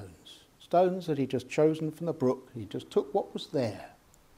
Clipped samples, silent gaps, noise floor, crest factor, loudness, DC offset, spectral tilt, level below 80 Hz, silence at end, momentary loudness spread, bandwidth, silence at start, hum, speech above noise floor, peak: under 0.1%; none; -54 dBFS; 18 dB; -30 LUFS; under 0.1%; -7 dB/octave; -68 dBFS; 0.5 s; 16 LU; 15.5 kHz; 0 s; none; 25 dB; -12 dBFS